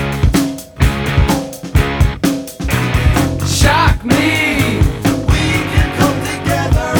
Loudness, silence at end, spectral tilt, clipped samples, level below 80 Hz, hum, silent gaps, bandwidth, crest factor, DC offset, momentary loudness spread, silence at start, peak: -14 LUFS; 0 s; -5 dB/octave; under 0.1%; -20 dBFS; none; none; over 20 kHz; 12 dB; under 0.1%; 6 LU; 0 s; 0 dBFS